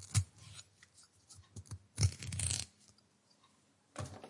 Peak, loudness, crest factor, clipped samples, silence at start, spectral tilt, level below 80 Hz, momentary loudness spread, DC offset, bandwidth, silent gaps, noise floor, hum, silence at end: -16 dBFS; -39 LUFS; 26 dB; under 0.1%; 0 s; -3.5 dB/octave; -62 dBFS; 24 LU; under 0.1%; 11.5 kHz; none; -71 dBFS; none; 0 s